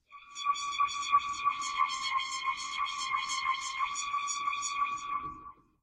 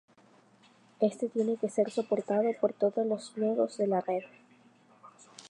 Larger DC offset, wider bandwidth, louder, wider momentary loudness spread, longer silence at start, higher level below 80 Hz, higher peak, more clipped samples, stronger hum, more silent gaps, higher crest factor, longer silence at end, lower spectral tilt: neither; about the same, 11.5 kHz vs 11 kHz; about the same, -32 LUFS vs -31 LUFS; first, 8 LU vs 4 LU; second, 0.1 s vs 1 s; first, -68 dBFS vs -88 dBFS; about the same, -14 dBFS vs -14 dBFS; neither; neither; neither; about the same, 20 dB vs 18 dB; first, 0.3 s vs 0.05 s; second, 2 dB/octave vs -6.5 dB/octave